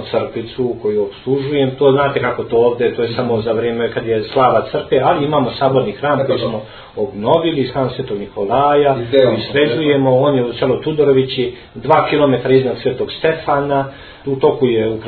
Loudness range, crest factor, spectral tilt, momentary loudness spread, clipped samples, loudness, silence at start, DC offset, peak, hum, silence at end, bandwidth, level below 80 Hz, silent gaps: 2 LU; 16 dB; -10 dB/octave; 8 LU; under 0.1%; -15 LUFS; 0 s; under 0.1%; 0 dBFS; none; 0 s; 4.6 kHz; -46 dBFS; none